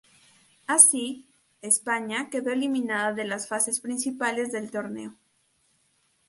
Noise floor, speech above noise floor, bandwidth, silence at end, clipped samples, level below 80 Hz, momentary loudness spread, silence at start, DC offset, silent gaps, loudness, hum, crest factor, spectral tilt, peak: -69 dBFS; 43 dB; 12 kHz; 1.15 s; under 0.1%; -78 dBFS; 21 LU; 0.7 s; under 0.1%; none; -24 LUFS; none; 28 dB; -1.5 dB/octave; 0 dBFS